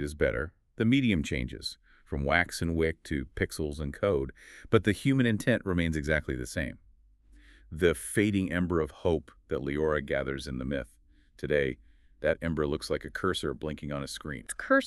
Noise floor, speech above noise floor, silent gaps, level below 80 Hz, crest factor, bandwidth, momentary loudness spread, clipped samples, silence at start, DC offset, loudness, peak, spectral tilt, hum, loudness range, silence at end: -60 dBFS; 30 dB; none; -44 dBFS; 22 dB; 13.5 kHz; 11 LU; under 0.1%; 0 s; under 0.1%; -30 LUFS; -8 dBFS; -5.5 dB/octave; none; 3 LU; 0 s